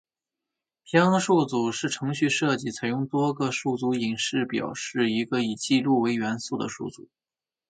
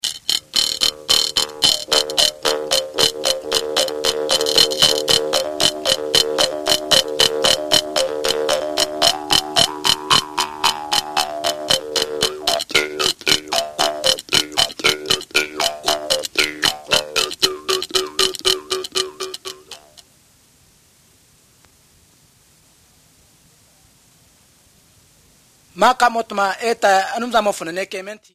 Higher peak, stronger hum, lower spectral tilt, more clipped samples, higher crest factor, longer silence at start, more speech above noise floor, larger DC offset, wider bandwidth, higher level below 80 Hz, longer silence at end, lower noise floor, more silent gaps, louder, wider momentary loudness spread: second, -6 dBFS vs 0 dBFS; neither; first, -5 dB/octave vs -0.5 dB/octave; neither; about the same, 20 dB vs 20 dB; first, 0.9 s vs 0.05 s; first, 63 dB vs 36 dB; neither; second, 9.4 kHz vs 15.5 kHz; second, -68 dBFS vs -52 dBFS; first, 0.7 s vs 0.2 s; first, -88 dBFS vs -54 dBFS; neither; second, -25 LUFS vs -17 LUFS; about the same, 8 LU vs 7 LU